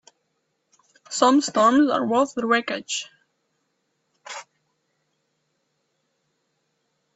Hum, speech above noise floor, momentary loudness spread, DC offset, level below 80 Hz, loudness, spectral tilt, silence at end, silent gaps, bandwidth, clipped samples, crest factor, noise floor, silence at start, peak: none; 54 dB; 20 LU; under 0.1%; -72 dBFS; -21 LUFS; -3 dB/octave; 2.75 s; none; 8.2 kHz; under 0.1%; 20 dB; -74 dBFS; 1.1 s; -4 dBFS